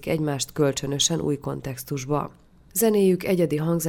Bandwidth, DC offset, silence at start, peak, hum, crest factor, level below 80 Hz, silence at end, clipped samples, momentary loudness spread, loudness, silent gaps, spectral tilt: 18 kHz; under 0.1%; 0 s; -8 dBFS; none; 16 dB; -52 dBFS; 0 s; under 0.1%; 11 LU; -24 LUFS; none; -4.5 dB/octave